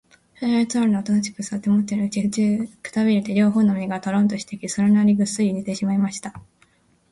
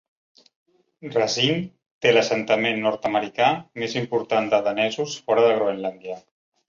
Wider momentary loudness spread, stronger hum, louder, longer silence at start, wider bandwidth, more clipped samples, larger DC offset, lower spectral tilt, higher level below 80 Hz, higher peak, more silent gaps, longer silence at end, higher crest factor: about the same, 10 LU vs 11 LU; neither; about the same, -21 LUFS vs -22 LUFS; second, 0.4 s vs 1 s; first, 11.5 kHz vs 7.6 kHz; neither; neither; first, -6 dB/octave vs -4 dB/octave; first, -60 dBFS vs -66 dBFS; second, -8 dBFS vs -4 dBFS; second, none vs 1.86-2.01 s; first, 0.7 s vs 0.5 s; second, 12 dB vs 20 dB